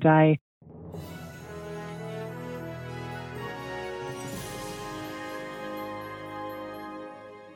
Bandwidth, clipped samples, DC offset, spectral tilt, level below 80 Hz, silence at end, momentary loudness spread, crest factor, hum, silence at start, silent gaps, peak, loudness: 16.5 kHz; under 0.1%; under 0.1%; -6.5 dB/octave; -60 dBFS; 0 s; 8 LU; 24 dB; none; 0 s; 0.41-0.61 s; -8 dBFS; -33 LUFS